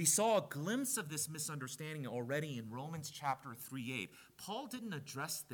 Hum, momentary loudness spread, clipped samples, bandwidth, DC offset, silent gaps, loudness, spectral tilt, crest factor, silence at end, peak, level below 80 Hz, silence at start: none; 10 LU; under 0.1%; 19 kHz; under 0.1%; none; -40 LUFS; -3.5 dB/octave; 22 dB; 0 s; -18 dBFS; -82 dBFS; 0 s